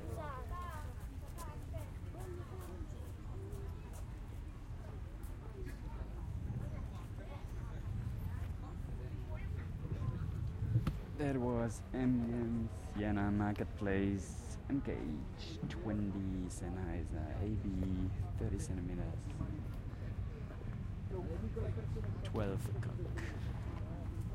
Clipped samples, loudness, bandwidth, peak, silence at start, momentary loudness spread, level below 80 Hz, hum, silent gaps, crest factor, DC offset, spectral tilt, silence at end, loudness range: under 0.1%; -42 LUFS; 16 kHz; -22 dBFS; 0 s; 11 LU; -48 dBFS; none; none; 18 dB; under 0.1%; -7.5 dB/octave; 0 s; 10 LU